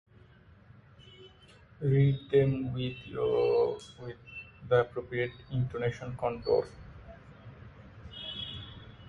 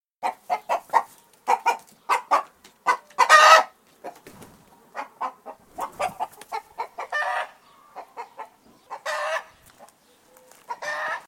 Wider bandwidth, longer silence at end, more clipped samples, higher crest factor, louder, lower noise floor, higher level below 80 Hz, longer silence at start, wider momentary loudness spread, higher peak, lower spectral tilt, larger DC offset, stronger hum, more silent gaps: second, 7.8 kHz vs 17 kHz; about the same, 0 s vs 0.1 s; neither; second, 18 dB vs 24 dB; second, -31 LUFS vs -22 LUFS; about the same, -57 dBFS vs -57 dBFS; first, -56 dBFS vs -72 dBFS; first, 1.05 s vs 0.2 s; about the same, 24 LU vs 26 LU; second, -14 dBFS vs 0 dBFS; first, -8 dB/octave vs 0.5 dB/octave; neither; neither; neither